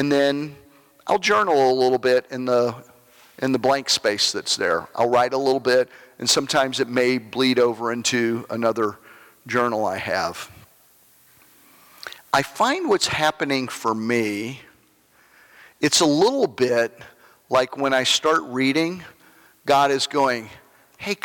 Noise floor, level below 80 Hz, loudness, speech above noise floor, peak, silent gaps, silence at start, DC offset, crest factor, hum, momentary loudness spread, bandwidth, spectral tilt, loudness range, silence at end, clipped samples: -58 dBFS; -64 dBFS; -21 LUFS; 37 dB; -6 dBFS; none; 0 s; under 0.1%; 16 dB; none; 11 LU; 18 kHz; -3 dB/octave; 5 LU; 0.1 s; under 0.1%